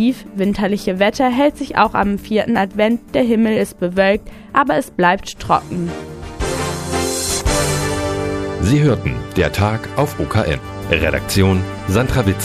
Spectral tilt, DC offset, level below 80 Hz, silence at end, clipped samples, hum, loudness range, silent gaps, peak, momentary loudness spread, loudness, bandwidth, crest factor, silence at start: -5 dB/octave; under 0.1%; -32 dBFS; 0 s; under 0.1%; none; 3 LU; none; 0 dBFS; 6 LU; -17 LUFS; 15.5 kHz; 16 dB; 0 s